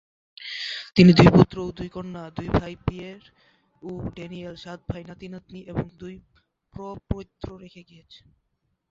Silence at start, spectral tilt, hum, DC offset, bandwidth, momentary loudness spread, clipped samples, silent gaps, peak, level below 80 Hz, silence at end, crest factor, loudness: 0.4 s; -7.5 dB/octave; none; under 0.1%; 7.6 kHz; 25 LU; under 0.1%; none; -2 dBFS; -44 dBFS; 1.1 s; 24 dB; -21 LUFS